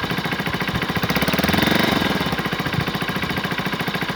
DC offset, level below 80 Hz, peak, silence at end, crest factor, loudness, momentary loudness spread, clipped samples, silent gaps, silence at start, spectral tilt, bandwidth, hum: under 0.1%; -42 dBFS; -2 dBFS; 0 s; 18 dB; -21 LUFS; 6 LU; under 0.1%; none; 0 s; -5 dB/octave; over 20 kHz; none